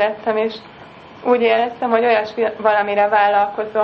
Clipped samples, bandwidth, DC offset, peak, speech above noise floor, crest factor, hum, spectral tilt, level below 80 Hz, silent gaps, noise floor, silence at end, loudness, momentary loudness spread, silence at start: under 0.1%; 6.2 kHz; under 0.1%; -2 dBFS; 23 dB; 16 dB; none; -6 dB/octave; -62 dBFS; none; -39 dBFS; 0 s; -17 LUFS; 7 LU; 0 s